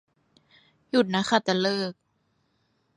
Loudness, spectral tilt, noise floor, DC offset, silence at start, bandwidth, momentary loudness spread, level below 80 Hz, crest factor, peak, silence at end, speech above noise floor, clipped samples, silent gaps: -25 LUFS; -5 dB/octave; -71 dBFS; under 0.1%; 0.95 s; 11.5 kHz; 6 LU; -72 dBFS; 22 dB; -6 dBFS; 1.05 s; 47 dB; under 0.1%; none